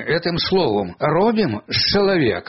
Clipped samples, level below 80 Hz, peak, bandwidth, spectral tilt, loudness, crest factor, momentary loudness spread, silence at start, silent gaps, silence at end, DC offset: under 0.1%; -44 dBFS; -4 dBFS; 6 kHz; -3.5 dB/octave; -18 LUFS; 14 dB; 5 LU; 0 s; none; 0.05 s; 0.3%